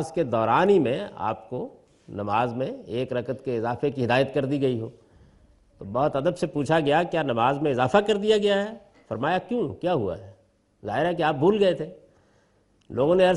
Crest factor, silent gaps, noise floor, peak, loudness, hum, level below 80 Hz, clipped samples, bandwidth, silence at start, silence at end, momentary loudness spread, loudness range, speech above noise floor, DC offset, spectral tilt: 20 dB; none; -63 dBFS; -4 dBFS; -24 LUFS; none; -58 dBFS; under 0.1%; 11.5 kHz; 0 s; 0 s; 14 LU; 4 LU; 40 dB; under 0.1%; -6.5 dB/octave